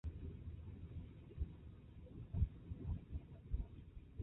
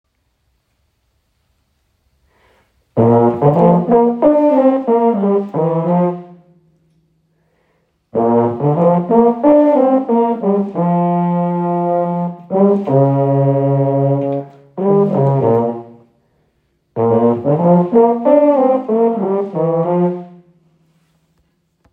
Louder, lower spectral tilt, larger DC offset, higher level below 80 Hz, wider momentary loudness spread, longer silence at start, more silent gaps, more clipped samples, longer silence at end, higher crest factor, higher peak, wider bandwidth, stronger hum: second, -50 LUFS vs -14 LUFS; about the same, -11 dB/octave vs -12 dB/octave; neither; first, -50 dBFS vs -56 dBFS; first, 15 LU vs 8 LU; second, 0.05 s vs 2.95 s; neither; neither; second, 0 s vs 1.65 s; first, 22 dB vs 14 dB; second, -24 dBFS vs 0 dBFS; about the same, 3.9 kHz vs 3.8 kHz; neither